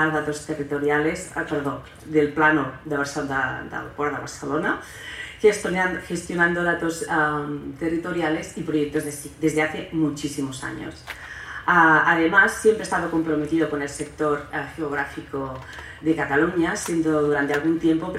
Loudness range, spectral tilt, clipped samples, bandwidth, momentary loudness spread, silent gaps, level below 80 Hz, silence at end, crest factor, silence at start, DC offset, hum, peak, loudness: 6 LU; -5 dB/octave; under 0.1%; 15 kHz; 13 LU; none; -52 dBFS; 0 s; 20 dB; 0 s; under 0.1%; none; -4 dBFS; -23 LUFS